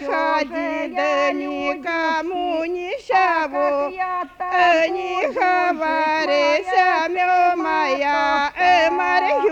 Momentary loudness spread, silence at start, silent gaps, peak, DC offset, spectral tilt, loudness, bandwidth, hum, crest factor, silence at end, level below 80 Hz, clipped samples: 8 LU; 0 s; none; -6 dBFS; under 0.1%; -3 dB/octave; -19 LUFS; 8.4 kHz; none; 14 dB; 0 s; -56 dBFS; under 0.1%